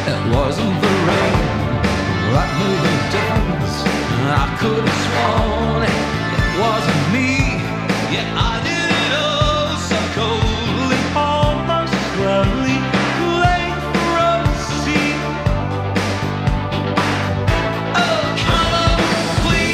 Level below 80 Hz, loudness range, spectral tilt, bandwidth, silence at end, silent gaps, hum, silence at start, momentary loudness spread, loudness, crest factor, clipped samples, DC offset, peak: -28 dBFS; 1 LU; -5.5 dB/octave; 15 kHz; 0 s; none; none; 0 s; 4 LU; -17 LUFS; 16 dB; under 0.1%; under 0.1%; -2 dBFS